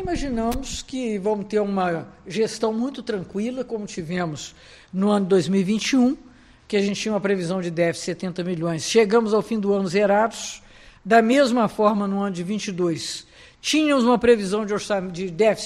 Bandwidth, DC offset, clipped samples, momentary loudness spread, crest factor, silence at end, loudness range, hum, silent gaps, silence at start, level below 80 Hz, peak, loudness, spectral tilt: 14 kHz; under 0.1%; under 0.1%; 12 LU; 18 dB; 0 s; 5 LU; none; none; 0 s; -46 dBFS; -4 dBFS; -22 LUFS; -5 dB/octave